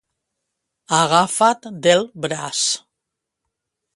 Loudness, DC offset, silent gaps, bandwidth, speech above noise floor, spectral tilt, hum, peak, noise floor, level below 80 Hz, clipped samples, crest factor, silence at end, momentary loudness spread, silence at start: -18 LUFS; under 0.1%; none; 11.5 kHz; 63 dB; -2.5 dB/octave; none; 0 dBFS; -81 dBFS; -66 dBFS; under 0.1%; 20 dB; 1.2 s; 10 LU; 0.9 s